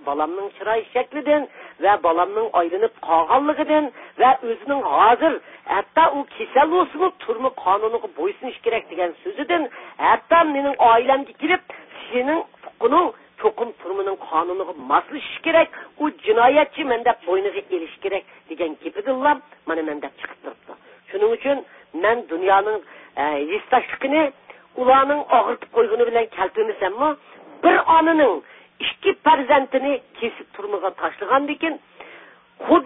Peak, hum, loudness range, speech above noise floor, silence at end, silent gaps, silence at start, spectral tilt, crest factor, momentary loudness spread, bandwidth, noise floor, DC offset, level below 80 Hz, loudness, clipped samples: -2 dBFS; none; 5 LU; 26 dB; 0 s; none; 0.05 s; -8.5 dB/octave; 18 dB; 13 LU; 4 kHz; -46 dBFS; under 0.1%; -60 dBFS; -20 LUFS; under 0.1%